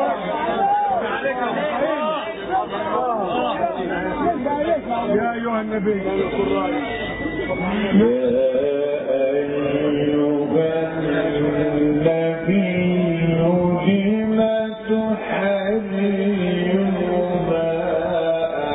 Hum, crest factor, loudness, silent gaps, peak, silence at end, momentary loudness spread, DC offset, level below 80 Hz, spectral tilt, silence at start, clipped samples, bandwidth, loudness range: none; 14 dB; -20 LUFS; none; -6 dBFS; 0 s; 5 LU; under 0.1%; -46 dBFS; -11 dB/octave; 0 s; under 0.1%; 4 kHz; 3 LU